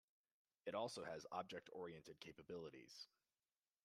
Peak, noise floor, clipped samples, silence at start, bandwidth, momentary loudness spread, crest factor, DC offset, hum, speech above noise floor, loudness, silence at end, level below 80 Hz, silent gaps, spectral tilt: -32 dBFS; under -90 dBFS; under 0.1%; 0.65 s; 14 kHz; 11 LU; 22 dB; under 0.1%; none; over 37 dB; -53 LUFS; 0.8 s; -88 dBFS; none; -4 dB/octave